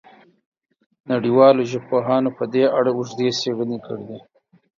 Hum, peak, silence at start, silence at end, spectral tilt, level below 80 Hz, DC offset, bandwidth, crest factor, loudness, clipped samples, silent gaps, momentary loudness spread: none; -2 dBFS; 1.1 s; 0.6 s; -6 dB/octave; -68 dBFS; under 0.1%; 7.4 kHz; 18 dB; -19 LUFS; under 0.1%; none; 17 LU